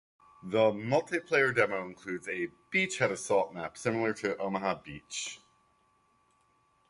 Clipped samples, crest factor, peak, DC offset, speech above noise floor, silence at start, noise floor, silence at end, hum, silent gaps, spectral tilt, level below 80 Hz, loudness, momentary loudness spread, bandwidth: under 0.1%; 22 dB; -10 dBFS; under 0.1%; 39 dB; 0.45 s; -70 dBFS; 1.55 s; none; none; -4 dB/octave; -70 dBFS; -31 LUFS; 12 LU; 11.5 kHz